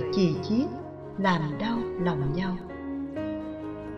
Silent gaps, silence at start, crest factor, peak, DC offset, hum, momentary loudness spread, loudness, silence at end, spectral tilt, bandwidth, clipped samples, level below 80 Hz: none; 0 s; 18 dB; -10 dBFS; under 0.1%; none; 11 LU; -29 LUFS; 0 s; -7.5 dB/octave; 6.8 kHz; under 0.1%; -50 dBFS